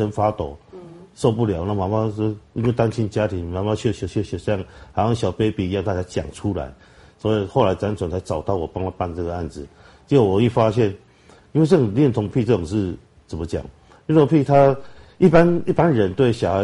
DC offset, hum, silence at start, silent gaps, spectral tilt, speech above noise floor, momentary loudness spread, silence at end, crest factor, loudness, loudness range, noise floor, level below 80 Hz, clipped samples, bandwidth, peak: under 0.1%; none; 0 s; none; -8 dB/octave; 31 dB; 13 LU; 0 s; 18 dB; -20 LUFS; 6 LU; -50 dBFS; -44 dBFS; under 0.1%; 11.5 kHz; -2 dBFS